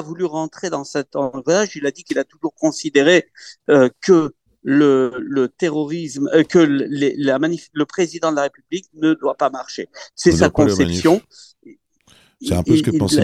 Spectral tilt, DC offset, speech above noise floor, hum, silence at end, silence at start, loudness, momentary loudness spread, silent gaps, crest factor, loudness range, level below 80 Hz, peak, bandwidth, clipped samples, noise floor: -5.5 dB/octave; under 0.1%; 36 dB; none; 0 s; 0 s; -18 LUFS; 11 LU; none; 18 dB; 3 LU; -48 dBFS; 0 dBFS; 13.5 kHz; under 0.1%; -54 dBFS